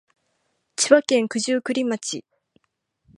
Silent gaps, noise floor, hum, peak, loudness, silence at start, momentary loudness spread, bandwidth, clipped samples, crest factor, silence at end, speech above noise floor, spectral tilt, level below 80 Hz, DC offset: none; -73 dBFS; none; -2 dBFS; -21 LUFS; 0.8 s; 15 LU; 11.5 kHz; under 0.1%; 22 dB; 1 s; 53 dB; -2.5 dB/octave; -74 dBFS; under 0.1%